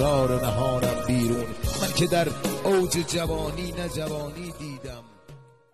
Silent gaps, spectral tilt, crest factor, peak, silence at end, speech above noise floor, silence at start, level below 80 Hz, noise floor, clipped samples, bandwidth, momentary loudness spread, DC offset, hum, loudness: none; -5 dB/octave; 16 dB; -10 dBFS; 0 s; 24 dB; 0 s; -40 dBFS; -49 dBFS; under 0.1%; 13.5 kHz; 14 LU; 0.6%; none; -26 LUFS